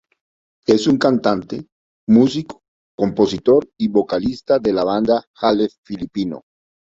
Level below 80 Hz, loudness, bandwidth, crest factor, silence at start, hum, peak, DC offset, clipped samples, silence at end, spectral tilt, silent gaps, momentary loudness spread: -52 dBFS; -18 LUFS; 7.8 kHz; 16 dB; 0.7 s; none; -2 dBFS; under 0.1%; under 0.1%; 0.55 s; -6.5 dB/octave; 1.72-2.07 s, 2.68-2.98 s, 5.27-5.34 s, 5.78-5.83 s; 14 LU